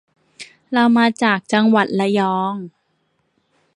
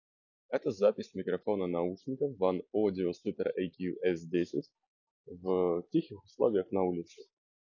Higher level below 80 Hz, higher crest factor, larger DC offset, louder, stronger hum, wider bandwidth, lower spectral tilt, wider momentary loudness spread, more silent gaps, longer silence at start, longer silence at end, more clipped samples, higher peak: about the same, -68 dBFS vs -66 dBFS; about the same, 18 dB vs 20 dB; neither; first, -17 LUFS vs -33 LUFS; neither; first, 10.5 kHz vs 7.2 kHz; second, -5.5 dB/octave vs -8 dB/octave; first, 24 LU vs 8 LU; second, none vs 4.87-5.24 s; about the same, 0.4 s vs 0.5 s; first, 1.1 s vs 0.5 s; neither; first, -2 dBFS vs -14 dBFS